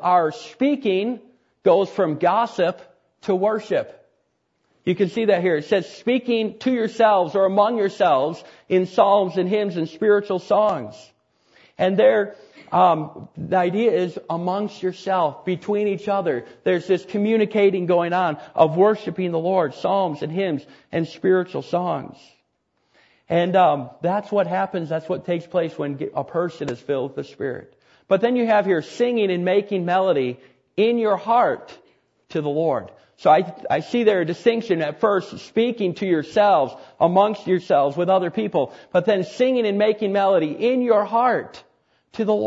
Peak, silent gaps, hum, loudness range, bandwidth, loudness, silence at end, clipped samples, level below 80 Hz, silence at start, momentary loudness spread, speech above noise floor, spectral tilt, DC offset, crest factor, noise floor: -2 dBFS; none; none; 4 LU; 8 kHz; -21 LUFS; 0 s; under 0.1%; -68 dBFS; 0 s; 10 LU; 50 dB; -7 dB/octave; under 0.1%; 18 dB; -70 dBFS